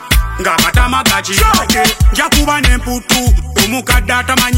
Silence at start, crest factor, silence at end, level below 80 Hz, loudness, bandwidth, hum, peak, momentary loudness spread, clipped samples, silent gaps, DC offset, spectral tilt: 0 s; 12 dB; 0 s; -16 dBFS; -11 LUFS; 17 kHz; none; 0 dBFS; 3 LU; under 0.1%; none; under 0.1%; -3.5 dB/octave